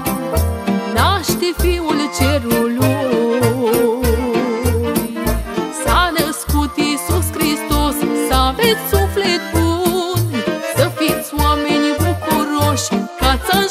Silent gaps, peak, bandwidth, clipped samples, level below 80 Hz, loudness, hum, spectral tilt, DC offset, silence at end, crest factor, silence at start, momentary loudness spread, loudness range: none; 0 dBFS; 16 kHz; under 0.1%; -26 dBFS; -16 LUFS; none; -5 dB/octave; under 0.1%; 0 s; 14 dB; 0 s; 4 LU; 1 LU